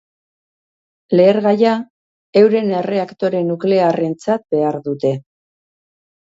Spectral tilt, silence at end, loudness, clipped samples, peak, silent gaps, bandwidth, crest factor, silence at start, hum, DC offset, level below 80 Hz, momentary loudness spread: -7.5 dB/octave; 1 s; -16 LUFS; under 0.1%; 0 dBFS; 1.90-2.33 s; 7.8 kHz; 16 dB; 1.1 s; none; under 0.1%; -64 dBFS; 8 LU